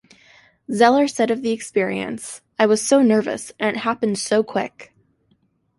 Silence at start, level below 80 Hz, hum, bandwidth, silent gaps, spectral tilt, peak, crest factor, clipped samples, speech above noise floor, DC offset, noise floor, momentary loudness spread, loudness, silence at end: 0.7 s; -64 dBFS; none; 11.5 kHz; none; -4 dB/octave; -2 dBFS; 18 dB; under 0.1%; 45 dB; under 0.1%; -64 dBFS; 13 LU; -19 LUFS; 0.95 s